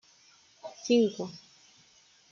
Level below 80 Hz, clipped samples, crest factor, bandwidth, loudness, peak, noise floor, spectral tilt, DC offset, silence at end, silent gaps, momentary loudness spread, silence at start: -80 dBFS; under 0.1%; 20 dB; 7.4 kHz; -29 LUFS; -14 dBFS; -62 dBFS; -5 dB/octave; under 0.1%; 0.95 s; none; 22 LU; 0.65 s